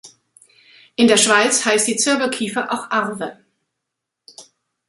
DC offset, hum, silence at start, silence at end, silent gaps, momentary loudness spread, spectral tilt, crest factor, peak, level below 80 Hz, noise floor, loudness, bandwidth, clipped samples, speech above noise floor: under 0.1%; none; 0.05 s; 0.45 s; none; 15 LU; -1.5 dB/octave; 18 dB; -2 dBFS; -66 dBFS; -80 dBFS; -16 LUFS; 12 kHz; under 0.1%; 63 dB